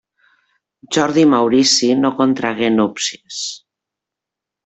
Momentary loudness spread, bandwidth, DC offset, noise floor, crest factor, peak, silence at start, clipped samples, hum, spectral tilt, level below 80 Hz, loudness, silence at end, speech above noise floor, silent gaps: 13 LU; 8.4 kHz; under 0.1%; -84 dBFS; 16 dB; 0 dBFS; 0.9 s; under 0.1%; none; -3.5 dB/octave; -60 dBFS; -15 LUFS; 1.1 s; 69 dB; none